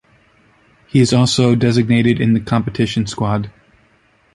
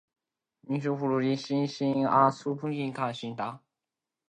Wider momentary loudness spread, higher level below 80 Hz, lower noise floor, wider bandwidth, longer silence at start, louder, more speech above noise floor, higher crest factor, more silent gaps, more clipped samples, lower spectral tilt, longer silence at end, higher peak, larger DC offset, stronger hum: second, 7 LU vs 11 LU; first, -44 dBFS vs -76 dBFS; second, -55 dBFS vs -89 dBFS; first, 11.5 kHz vs 9.6 kHz; first, 0.95 s vs 0.65 s; first, -15 LUFS vs -29 LUFS; second, 41 dB vs 61 dB; second, 16 dB vs 22 dB; neither; neither; about the same, -6 dB/octave vs -7 dB/octave; first, 0.85 s vs 0.7 s; first, -2 dBFS vs -8 dBFS; neither; neither